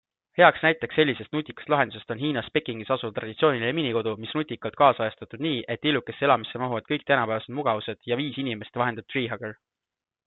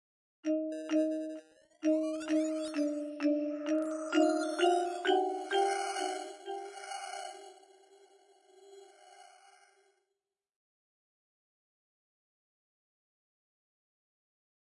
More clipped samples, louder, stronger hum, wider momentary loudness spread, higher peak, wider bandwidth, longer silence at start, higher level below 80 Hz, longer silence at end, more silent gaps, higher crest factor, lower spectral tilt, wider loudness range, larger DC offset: neither; first, -25 LUFS vs -33 LUFS; neither; second, 10 LU vs 13 LU; first, -2 dBFS vs -16 dBFS; second, 4.2 kHz vs 11.5 kHz; about the same, 0.35 s vs 0.45 s; first, -66 dBFS vs -90 dBFS; second, 0.75 s vs 5.5 s; neither; about the same, 24 dB vs 20 dB; first, -9.5 dB/octave vs -1.5 dB/octave; second, 3 LU vs 16 LU; neither